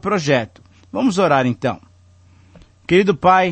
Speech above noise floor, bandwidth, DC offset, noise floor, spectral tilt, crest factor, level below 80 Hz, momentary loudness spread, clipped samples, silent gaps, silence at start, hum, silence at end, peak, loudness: 33 dB; 8.8 kHz; under 0.1%; -49 dBFS; -6 dB/octave; 16 dB; -52 dBFS; 18 LU; under 0.1%; none; 0.05 s; none; 0 s; -2 dBFS; -17 LUFS